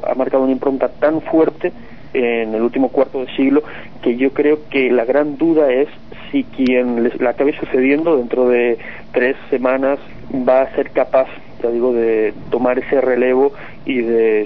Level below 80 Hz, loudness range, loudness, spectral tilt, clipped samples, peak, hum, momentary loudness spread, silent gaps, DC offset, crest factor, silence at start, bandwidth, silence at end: -48 dBFS; 1 LU; -16 LUFS; -8.5 dB/octave; under 0.1%; -2 dBFS; none; 8 LU; none; 2%; 14 dB; 0 s; 5.8 kHz; 0 s